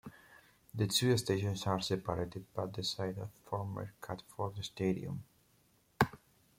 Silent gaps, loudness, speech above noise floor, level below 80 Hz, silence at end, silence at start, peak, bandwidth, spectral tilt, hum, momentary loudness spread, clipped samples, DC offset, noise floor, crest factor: none; -37 LUFS; 34 dB; -64 dBFS; 0.4 s; 0.05 s; -12 dBFS; 16.5 kHz; -5 dB/octave; none; 14 LU; under 0.1%; under 0.1%; -71 dBFS; 26 dB